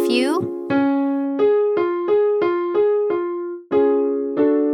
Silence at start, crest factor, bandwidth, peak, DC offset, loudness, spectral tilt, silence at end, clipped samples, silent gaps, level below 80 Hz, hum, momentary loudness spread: 0 s; 12 dB; 13.5 kHz; -6 dBFS; under 0.1%; -19 LUFS; -6 dB/octave; 0 s; under 0.1%; none; -66 dBFS; none; 5 LU